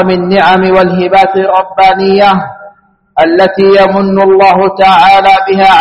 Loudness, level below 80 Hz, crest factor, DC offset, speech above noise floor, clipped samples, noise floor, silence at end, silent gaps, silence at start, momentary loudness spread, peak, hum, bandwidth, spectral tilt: -6 LUFS; -40 dBFS; 6 dB; under 0.1%; 33 dB; 2%; -39 dBFS; 0 s; none; 0 s; 5 LU; 0 dBFS; none; 9 kHz; -6.5 dB/octave